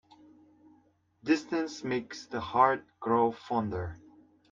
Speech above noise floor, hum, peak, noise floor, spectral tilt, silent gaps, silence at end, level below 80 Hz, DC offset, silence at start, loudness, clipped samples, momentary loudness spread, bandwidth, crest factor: 37 dB; none; -10 dBFS; -67 dBFS; -6 dB/octave; none; 0.55 s; -64 dBFS; under 0.1%; 1.25 s; -30 LUFS; under 0.1%; 13 LU; 7.6 kHz; 22 dB